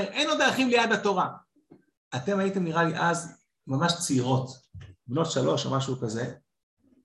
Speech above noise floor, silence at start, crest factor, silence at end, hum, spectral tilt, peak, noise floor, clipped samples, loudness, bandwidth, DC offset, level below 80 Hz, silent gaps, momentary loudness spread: 32 dB; 0 s; 18 dB; 0.65 s; none; -4.5 dB/octave; -10 dBFS; -59 dBFS; under 0.1%; -26 LUFS; 12.5 kHz; under 0.1%; -64 dBFS; 1.97-2.11 s; 13 LU